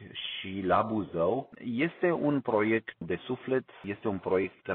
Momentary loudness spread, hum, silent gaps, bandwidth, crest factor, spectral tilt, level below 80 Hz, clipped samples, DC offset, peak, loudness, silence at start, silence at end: 9 LU; none; none; 4.3 kHz; 20 dB; -4.5 dB/octave; -66 dBFS; under 0.1%; under 0.1%; -12 dBFS; -31 LUFS; 0 s; 0 s